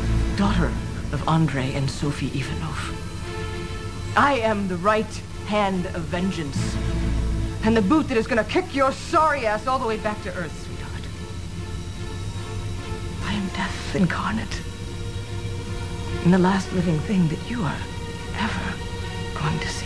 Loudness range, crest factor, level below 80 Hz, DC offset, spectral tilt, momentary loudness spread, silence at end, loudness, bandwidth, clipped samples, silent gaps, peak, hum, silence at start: 6 LU; 20 dB; -34 dBFS; 0.8%; -6 dB/octave; 12 LU; 0 s; -25 LUFS; 11 kHz; under 0.1%; none; -4 dBFS; none; 0 s